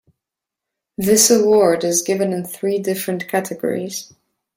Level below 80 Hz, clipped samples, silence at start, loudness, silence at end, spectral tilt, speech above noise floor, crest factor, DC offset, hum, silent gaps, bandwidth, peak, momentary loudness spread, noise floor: -60 dBFS; under 0.1%; 1 s; -17 LUFS; 0.55 s; -3.5 dB/octave; 67 dB; 18 dB; under 0.1%; none; none; 16.5 kHz; -2 dBFS; 13 LU; -84 dBFS